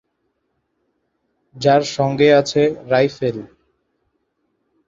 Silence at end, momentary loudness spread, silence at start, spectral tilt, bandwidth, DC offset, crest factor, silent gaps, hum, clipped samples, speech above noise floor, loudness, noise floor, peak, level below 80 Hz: 1.4 s; 11 LU; 1.55 s; -5.5 dB/octave; 7.8 kHz; under 0.1%; 18 dB; none; none; under 0.1%; 55 dB; -16 LUFS; -71 dBFS; -2 dBFS; -58 dBFS